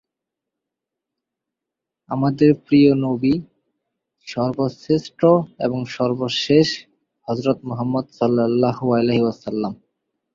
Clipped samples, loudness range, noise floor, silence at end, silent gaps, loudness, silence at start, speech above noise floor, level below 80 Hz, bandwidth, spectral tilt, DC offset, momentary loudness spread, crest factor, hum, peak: under 0.1%; 2 LU; -84 dBFS; 0.6 s; none; -19 LUFS; 2.1 s; 66 dB; -56 dBFS; 7.6 kHz; -7 dB/octave; under 0.1%; 10 LU; 18 dB; none; -2 dBFS